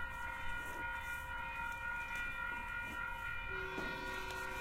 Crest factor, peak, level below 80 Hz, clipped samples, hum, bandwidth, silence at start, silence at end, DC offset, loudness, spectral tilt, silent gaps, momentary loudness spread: 12 dB; -30 dBFS; -54 dBFS; under 0.1%; none; 16 kHz; 0 s; 0 s; under 0.1%; -42 LUFS; -3.5 dB/octave; none; 2 LU